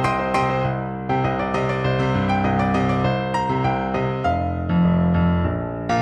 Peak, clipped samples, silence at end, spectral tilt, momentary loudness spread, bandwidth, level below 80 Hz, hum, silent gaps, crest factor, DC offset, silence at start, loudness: -6 dBFS; under 0.1%; 0 s; -7.5 dB/octave; 5 LU; 9.4 kHz; -38 dBFS; none; none; 14 dB; under 0.1%; 0 s; -21 LUFS